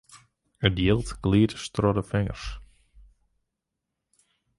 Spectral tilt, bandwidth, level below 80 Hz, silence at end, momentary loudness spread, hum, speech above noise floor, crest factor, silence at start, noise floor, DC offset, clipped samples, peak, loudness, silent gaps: -6.5 dB/octave; 11.5 kHz; -42 dBFS; 1.95 s; 14 LU; none; 59 dB; 24 dB; 0.15 s; -84 dBFS; under 0.1%; under 0.1%; -4 dBFS; -25 LUFS; none